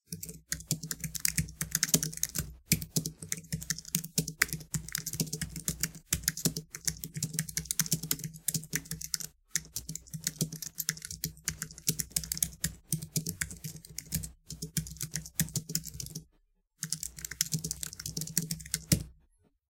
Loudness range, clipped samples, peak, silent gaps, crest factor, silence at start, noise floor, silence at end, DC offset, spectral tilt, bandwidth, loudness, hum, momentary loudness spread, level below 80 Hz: 4 LU; under 0.1%; -2 dBFS; none; 34 dB; 0.1 s; -71 dBFS; 0.6 s; under 0.1%; -2.5 dB/octave; 17 kHz; -34 LUFS; none; 8 LU; -52 dBFS